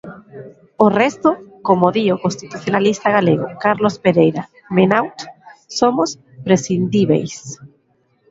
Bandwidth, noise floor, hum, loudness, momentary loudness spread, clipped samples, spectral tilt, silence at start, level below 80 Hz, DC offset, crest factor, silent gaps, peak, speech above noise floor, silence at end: 7.8 kHz; -61 dBFS; none; -16 LUFS; 19 LU; under 0.1%; -6 dB/octave; 0.05 s; -56 dBFS; under 0.1%; 16 dB; none; 0 dBFS; 45 dB; 0.65 s